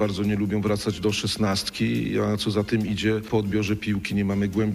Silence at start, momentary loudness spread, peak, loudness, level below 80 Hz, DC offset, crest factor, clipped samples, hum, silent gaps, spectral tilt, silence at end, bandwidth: 0 s; 1 LU; -10 dBFS; -25 LUFS; -48 dBFS; under 0.1%; 14 dB; under 0.1%; none; none; -5.5 dB/octave; 0 s; 15.5 kHz